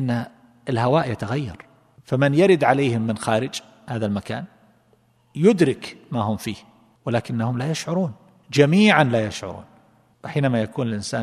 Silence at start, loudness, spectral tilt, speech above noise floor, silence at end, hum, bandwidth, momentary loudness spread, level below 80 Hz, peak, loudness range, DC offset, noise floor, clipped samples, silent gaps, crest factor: 0 s; -21 LUFS; -6 dB/octave; 40 dB; 0 s; none; 13.5 kHz; 18 LU; -58 dBFS; 0 dBFS; 3 LU; under 0.1%; -60 dBFS; under 0.1%; none; 22 dB